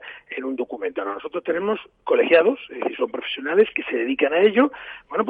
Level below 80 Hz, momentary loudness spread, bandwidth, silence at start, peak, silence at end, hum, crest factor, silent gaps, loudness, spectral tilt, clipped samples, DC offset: -66 dBFS; 12 LU; 4.5 kHz; 0 s; -4 dBFS; 0 s; none; 18 dB; none; -22 LUFS; -7 dB/octave; under 0.1%; under 0.1%